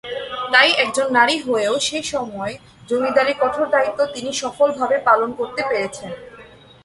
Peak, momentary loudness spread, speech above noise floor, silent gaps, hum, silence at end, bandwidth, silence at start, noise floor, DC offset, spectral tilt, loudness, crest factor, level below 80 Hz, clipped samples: 0 dBFS; 13 LU; 25 dB; none; none; 0.35 s; 11.5 kHz; 0.05 s; -44 dBFS; under 0.1%; -2 dB/octave; -18 LUFS; 20 dB; -58 dBFS; under 0.1%